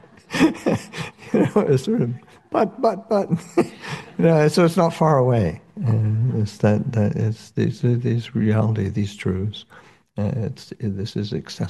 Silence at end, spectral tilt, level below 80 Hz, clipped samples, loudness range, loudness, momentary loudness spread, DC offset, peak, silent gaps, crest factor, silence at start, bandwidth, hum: 0 s; -7.5 dB/octave; -56 dBFS; under 0.1%; 4 LU; -21 LUFS; 11 LU; under 0.1%; -4 dBFS; none; 16 dB; 0.3 s; 12.5 kHz; none